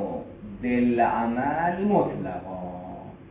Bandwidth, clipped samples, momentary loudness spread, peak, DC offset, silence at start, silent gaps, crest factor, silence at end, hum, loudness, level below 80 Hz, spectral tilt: 3.9 kHz; under 0.1%; 16 LU; -8 dBFS; under 0.1%; 0 s; none; 18 dB; 0 s; none; -25 LUFS; -50 dBFS; -11.5 dB/octave